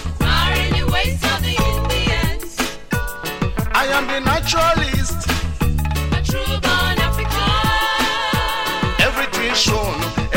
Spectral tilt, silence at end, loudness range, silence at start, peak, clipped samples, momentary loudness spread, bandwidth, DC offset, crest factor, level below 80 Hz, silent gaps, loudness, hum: -4 dB/octave; 0 s; 2 LU; 0 s; -2 dBFS; under 0.1%; 7 LU; 17 kHz; under 0.1%; 16 dB; -26 dBFS; none; -18 LUFS; none